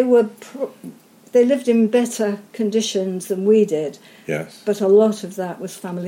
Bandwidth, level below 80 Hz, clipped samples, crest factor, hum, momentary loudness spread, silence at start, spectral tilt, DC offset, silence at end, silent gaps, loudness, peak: 16.5 kHz; -74 dBFS; under 0.1%; 14 dB; none; 14 LU; 0 s; -5.5 dB/octave; under 0.1%; 0 s; none; -19 LUFS; -4 dBFS